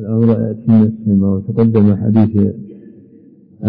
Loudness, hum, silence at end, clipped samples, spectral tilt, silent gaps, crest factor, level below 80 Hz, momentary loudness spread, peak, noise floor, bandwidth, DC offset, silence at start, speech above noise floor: -13 LUFS; none; 0 s; under 0.1%; -13.5 dB/octave; none; 10 dB; -50 dBFS; 5 LU; -2 dBFS; -43 dBFS; 3.9 kHz; under 0.1%; 0 s; 31 dB